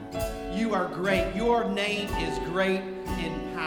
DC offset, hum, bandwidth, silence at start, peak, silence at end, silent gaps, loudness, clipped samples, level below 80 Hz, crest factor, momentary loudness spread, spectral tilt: under 0.1%; none; over 20 kHz; 0 s; -12 dBFS; 0 s; none; -28 LUFS; under 0.1%; -42 dBFS; 16 dB; 7 LU; -5.5 dB/octave